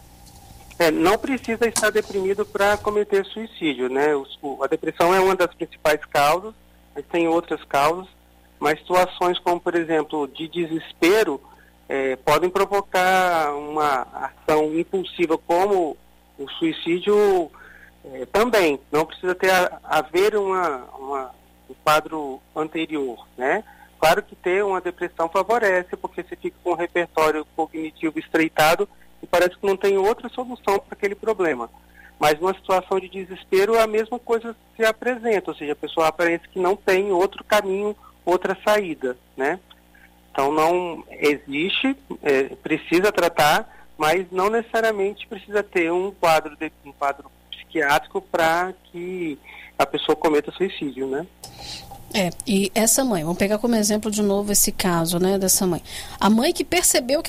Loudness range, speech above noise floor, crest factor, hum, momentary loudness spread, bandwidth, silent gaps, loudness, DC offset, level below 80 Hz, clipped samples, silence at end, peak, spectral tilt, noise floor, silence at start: 3 LU; 30 dB; 16 dB; 60 Hz at -55 dBFS; 12 LU; 16 kHz; none; -21 LUFS; under 0.1%; -50 dBFS; under 0.1%; 0 s; -6 dBFS; -3.5 dB/octave; -52 dBFS; 0.35 s